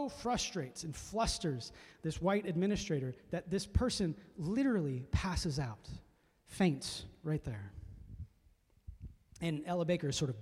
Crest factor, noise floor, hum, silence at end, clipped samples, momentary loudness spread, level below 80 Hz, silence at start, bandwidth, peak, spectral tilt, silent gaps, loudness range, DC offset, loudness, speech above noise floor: 20 dB; -68 dBFS; none; 0 s; under 0.1%; 19 LU; -50 dBFS; 0 s; 15.5 kHz; -18 dBFS; -5.5 dB/octave; none; 5 LU; under 0.1%; -37 LUFS; 32 dB